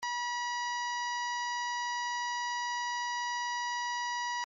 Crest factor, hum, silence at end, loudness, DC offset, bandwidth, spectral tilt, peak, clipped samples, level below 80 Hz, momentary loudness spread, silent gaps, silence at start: 8 dB; none; 0 s; -33 LUFS; under 0.1%; 7.4 kHz; 5 dB/octave; -28 dBFS; under 0.1%; -88 dBFS; 0 LU; none; 0 s